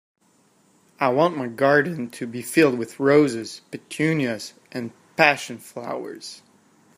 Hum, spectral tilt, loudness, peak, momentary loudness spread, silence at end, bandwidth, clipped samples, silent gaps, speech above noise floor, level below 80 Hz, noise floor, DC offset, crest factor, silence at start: none; -5 dB/octave; -22 LUFS; 0 dBFS; 16 LU; 0.6 s; 15.5 kHz; under 0.1%; none; 39 dB; -70 dBFS; -61 dBFS; under 0.1%; 24 dB; 1 s